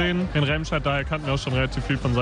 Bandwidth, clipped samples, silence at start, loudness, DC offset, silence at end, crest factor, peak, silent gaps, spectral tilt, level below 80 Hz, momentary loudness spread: 10 kHz; under 0.1%; 0 s; -24 LUFS; under 0.1%; 0 s; 14 dB; -10 dBFS; none; -6 dB/octave; -34 dBFS; 3 LU